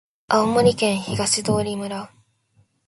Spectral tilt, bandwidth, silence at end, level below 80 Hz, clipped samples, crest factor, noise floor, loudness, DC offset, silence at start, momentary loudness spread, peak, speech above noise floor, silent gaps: -4 dB/octave; 11.5 kHz; 0.8 s; -52 dBFS; under 0.1%; 20 dB; -62 dBFS; -20 LUFS; under 0.1%; 0.3 s; 13 LU; -2 dBFS; 42 dB; none